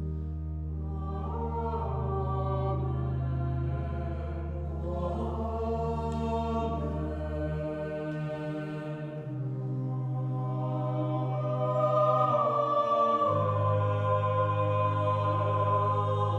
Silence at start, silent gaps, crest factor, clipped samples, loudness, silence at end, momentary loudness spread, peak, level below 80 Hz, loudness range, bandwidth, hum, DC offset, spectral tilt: 0 s; none; 16 dB; under 0.1%; -30 LUFS; 0 s; 10 LU; -14 dBFS; -42 dBFS; 7 LU; 7.8 kHz; none; under 0.1%; -9 dB/octave